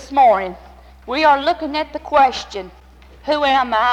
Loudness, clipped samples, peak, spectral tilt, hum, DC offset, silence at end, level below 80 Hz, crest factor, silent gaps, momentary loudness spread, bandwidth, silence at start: -16 LUFS; under 0.1%; -4 dBFS; -4 dB/octave; none; under 0.1%; 0 s; -44 dBFS; 14 dB; none; 16 LU; 9.4 kHz; 0 s